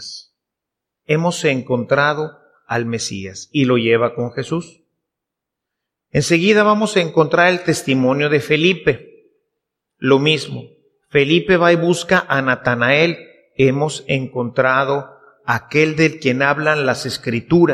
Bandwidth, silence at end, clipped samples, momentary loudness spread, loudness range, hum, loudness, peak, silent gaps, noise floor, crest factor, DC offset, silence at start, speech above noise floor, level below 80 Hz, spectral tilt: 14.5 kHz; 0 s; under 0.1%; 11 LU; 5 LU; none; -16 LUFS; 0 dBFS; none; -82 dBFS; 18 dB; under 0.1%; 0 s; 66 dB; -54 dBFS; -5 dB/octave